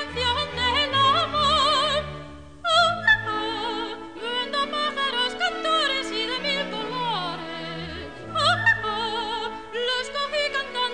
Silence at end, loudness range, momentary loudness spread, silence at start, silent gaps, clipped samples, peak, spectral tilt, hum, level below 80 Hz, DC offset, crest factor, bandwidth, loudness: 0 s; 4 LU; 13 LU; 0 s; none; under 0.1%; -8 dBFS; -3 dB/octave; none; -48 dBFS; 0.3%; 18 dB; 10 kHz; -23 LUFS